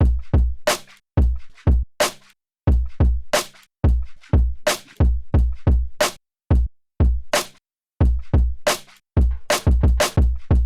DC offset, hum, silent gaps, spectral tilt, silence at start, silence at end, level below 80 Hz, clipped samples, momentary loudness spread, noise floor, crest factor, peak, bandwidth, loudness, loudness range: under 0.1%; none; none; -5 dB/octave; 0 s; 0 s; -22 dBFS; under 0.1%; 5 LU; -57 dBFS; 12 dB; -6 dBFS; 15.5 kHz; -21 LUFS; 1 LU